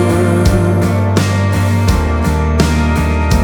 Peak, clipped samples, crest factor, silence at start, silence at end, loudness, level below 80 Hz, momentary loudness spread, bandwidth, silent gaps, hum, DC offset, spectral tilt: 0 dBFS; under 0.1%; 12 dB; 0 s; 0 s; -13 LUFS; -18 dBFS; 2 LU; 19 kHz; none; none; under 0.1%; -6.5 dB/octave